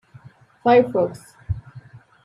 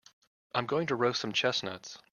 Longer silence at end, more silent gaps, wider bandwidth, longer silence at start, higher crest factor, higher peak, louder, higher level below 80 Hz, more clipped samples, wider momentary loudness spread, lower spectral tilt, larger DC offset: first, 0.45 s vs 0.15 s; neither; about the same, 11.5 kHz vs 10.5 kHz; about the same, 0.65 s vs 0.55 s; about the same, 18 dB vs 20 dB; first, -4 dBFS vs -12 dBFS; first, -20 LUFS vs -31 LUFS; first, -46 dBFS vs -74 dBFS; neither; first, 15 LU vs 9 LU; first, -7.5 dB/octave vs -4 dB/octave; neither